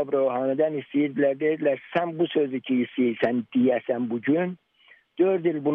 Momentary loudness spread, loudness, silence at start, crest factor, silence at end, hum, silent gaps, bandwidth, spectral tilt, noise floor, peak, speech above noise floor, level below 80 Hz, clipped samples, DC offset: 4 LU; -25 LUFS; 0 s; 14 dB; 0 s; none; none; 4.2 kHz; -9.5 dB/octave; -58 dBFS; -10 dBFS; 34 dB; -74 dBFS; under 0.1%; under 0.1%